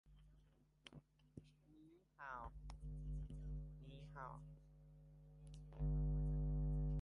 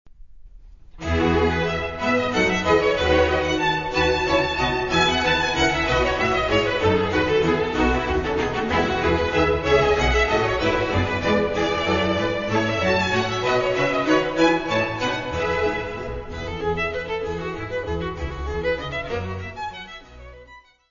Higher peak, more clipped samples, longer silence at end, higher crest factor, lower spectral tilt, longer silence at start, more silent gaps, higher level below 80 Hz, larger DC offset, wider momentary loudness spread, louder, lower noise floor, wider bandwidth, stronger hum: second, -36 dBFS vs -4 dBFS; neither; second, 0 s vs 0.3 s; second, 12 dB vs 18 dB; first, -9 dB/octave vs -5 dB/octave; about the same, 0.05 s vs 0.05 s; neither; second, -50 dBFS vs -36 dBFS; neither; first, 23 LU vs 10 LU; second, -48 LUFS vs -21 LUFS; first, -73 dBFS vs -48 dBFS; second, 6 kHz vs 7.4 kHz; neither